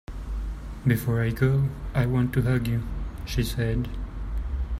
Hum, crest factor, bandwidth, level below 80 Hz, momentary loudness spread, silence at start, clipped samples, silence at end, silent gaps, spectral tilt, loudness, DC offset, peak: none; 18 dB; 16 kHz; -34 dBFS; 11 LU; 0.1 s; under 0.1%; 0 s; none; -7 dB/octave; -27 LUFS; under 0.1%; -8 dBFS